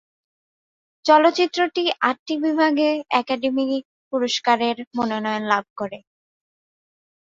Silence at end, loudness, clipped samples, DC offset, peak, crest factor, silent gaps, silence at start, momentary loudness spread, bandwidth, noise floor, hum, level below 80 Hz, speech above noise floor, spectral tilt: 1.4 s; -21 LUFS; under 0.1%; under 0.1%; -2 dBFS; 20 dB; 2.19-2.26 s, 3.85-4.11 s, 4.87-4.91 s, 5.70-5.76 s; 1.05 s; 12 LU; 7.8 kHz; under -90 dBFS; none; -68 dBFS; over 70 dB; -3.5 dB/octave